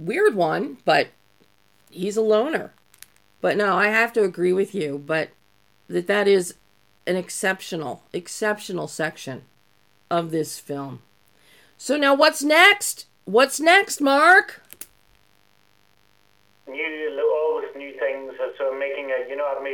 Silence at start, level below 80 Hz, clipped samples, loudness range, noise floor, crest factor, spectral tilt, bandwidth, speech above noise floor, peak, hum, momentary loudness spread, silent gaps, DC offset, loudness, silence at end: 0 s; -74 dBFS; under 0.1%; 11 LU; -62 dBFS; 20 dB; -3.5 dB/octave; 17.5 kHz; 41 dB; -2 dBFS; none; 18 LU; none; under 0.1%; -21 LUFS; 0 s